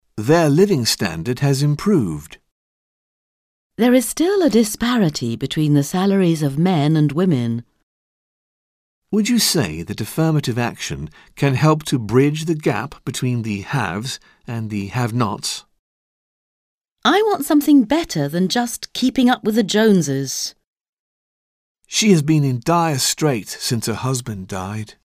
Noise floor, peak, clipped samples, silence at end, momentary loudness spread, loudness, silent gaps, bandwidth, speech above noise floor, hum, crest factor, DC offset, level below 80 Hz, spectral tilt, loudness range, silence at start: under -90 dBFS; -2 dBFS; under 0.1%; 0.15 s; 12 LU; -18 LUFS; 2.51-3.70 s, 7.83-9.02 s, 15.79-16.81 s, 16.92-16.96 s, 20.67-20.73 s, 20.89-21.75 s; 16 kHz; over 72 dB; none; 18 dB; under 0.1%; -50 dBFS; -5 dB/octave; 5 LU; 0.15 s